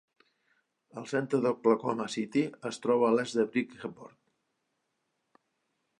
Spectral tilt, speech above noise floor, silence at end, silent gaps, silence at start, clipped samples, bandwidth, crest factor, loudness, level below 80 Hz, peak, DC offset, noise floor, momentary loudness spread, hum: -5.5 dB/octave; 51 dB; 1.9 s; none; 0.95 s; under 0.1%; 11 kHz; 20 dB; -30 LUFS; -80 dBFS; -12 dBFS; under 0.1%; -81 dBFS; 16 LU; none